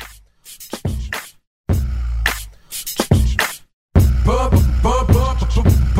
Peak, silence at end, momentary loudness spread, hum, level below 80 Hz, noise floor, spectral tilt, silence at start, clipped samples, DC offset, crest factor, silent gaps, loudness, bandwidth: 0 dBFS; 0 s; 14 LU; none; -20 dBFS; -42 dBFS; -5.5 dB/octave; 0 s; under 0.1%; 0.2%; 16 dB; 1.47-1.64 s, 3.73-3.89 s; -18 LUFS; 16.5 kHz